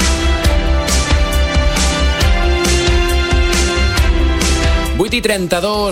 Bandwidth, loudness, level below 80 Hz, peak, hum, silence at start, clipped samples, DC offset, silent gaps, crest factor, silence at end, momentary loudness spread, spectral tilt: 16 kHz; -14 LUFS; -16 dBFS; -2 dBFS; none; 0 s; under 0.1%; under 0.1%; none; 12 dB; 0 s; 2 LU; -4 dB/octave